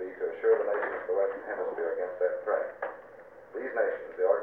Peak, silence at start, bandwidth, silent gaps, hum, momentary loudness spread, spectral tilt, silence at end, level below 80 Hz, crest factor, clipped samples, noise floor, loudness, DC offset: -12 dBFS; 0 s; 3.6 kHz; none; none; 13 LU; -7 dB/octave; 0 s; -74 dBFS; 18 dB; under 0.1%; -50 dBFS; -31 LUFS; under 0.1%